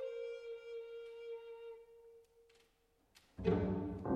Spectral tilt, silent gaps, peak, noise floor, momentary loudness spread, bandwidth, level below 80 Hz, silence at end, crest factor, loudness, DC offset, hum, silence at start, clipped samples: -9 dB/octave; none; -20 dBFS; -76 dBFS; 23 LU; 9.4 kHz; -60 dBFS; 0 s; 22 dB; -43 LUFS; under 0.1%; none; 0 s; under 0.1%